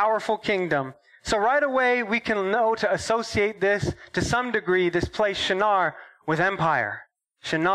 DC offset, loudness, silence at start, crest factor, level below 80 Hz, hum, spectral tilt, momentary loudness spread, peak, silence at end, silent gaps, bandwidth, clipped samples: under 0.1%; -24 LUFS; 0 s; 14 dB; -50 dBFS; none; -4.5 dB/octave; 7 LU; -10 dBFS; 0 s; none; 12.5 kHz; under 0.1%